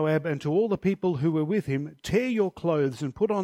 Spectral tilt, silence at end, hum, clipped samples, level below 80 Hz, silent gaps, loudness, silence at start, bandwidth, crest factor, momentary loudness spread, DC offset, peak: -7.5 dB/octave; 0 s; none; under 0.1%; -56 dBFS; none; -27 LUFS; 0 s; 14.5 kHz; 14 dB; 4 LU; under 0.1%; -12 dBFS